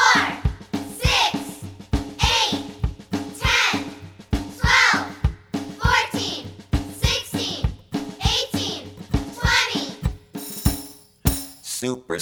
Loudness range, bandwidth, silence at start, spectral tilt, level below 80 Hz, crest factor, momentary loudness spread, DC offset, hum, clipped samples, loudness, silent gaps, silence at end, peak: 4 LU; over 20 kHz; 0 s; -3.5 dB/octave; -32 dBFS; 22 dB; 13 LU; under 0.1%; none; under 0.1%; -22 LUFS; none; 0 s; -2 dBFS